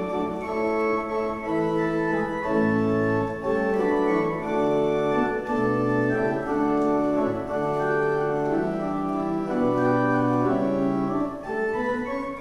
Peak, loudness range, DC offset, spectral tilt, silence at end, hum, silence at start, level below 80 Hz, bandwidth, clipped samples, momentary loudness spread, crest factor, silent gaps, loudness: -10 dBFS; 1 LU; under 0.1%; -8 dB/octave; 0 s; none; 0 s; -50 dBFS; 10.5 kHz; under 0.1%; 5 LU; 14 dB; none; -24 LUFS